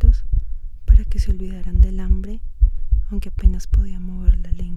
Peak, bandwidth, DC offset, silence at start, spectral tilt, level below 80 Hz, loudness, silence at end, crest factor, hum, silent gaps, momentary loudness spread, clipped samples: 0 dBFS; 6.4 kHz; under 0.1%; 0 s; -8 dB/octave; -18 dBFS; -22 LUFS; 0 s; 16 dB; none; none; 10 LU; under 0.1%